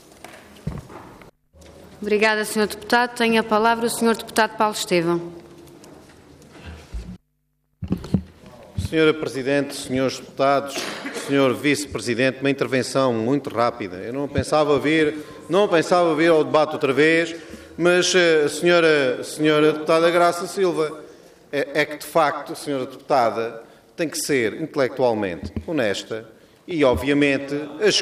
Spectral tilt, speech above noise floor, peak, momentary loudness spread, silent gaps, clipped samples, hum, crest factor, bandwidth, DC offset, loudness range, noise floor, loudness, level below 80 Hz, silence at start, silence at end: -4.5 dB/octave; 50 dB; -6 dBFS; 15 LU; none; under 0.1%; none; 16 dB; 15.5 kHz; under 0.1%; 7 LU; -70 dBFS; -20 LUFS; -48 dBFS; 0.25 s; 0 s